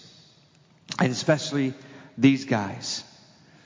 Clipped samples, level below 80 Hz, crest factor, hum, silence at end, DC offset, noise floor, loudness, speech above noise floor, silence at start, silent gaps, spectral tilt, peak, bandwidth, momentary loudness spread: under 0.1%; -66 dBFS; 22 dB; none; 0.65 s; under 0.1%; -58 dBFS; -25 LUFS; 34 dB; 0.9 s; none; -5 dB/octave; -6 dBFS; 7.6 kHz; 14 LU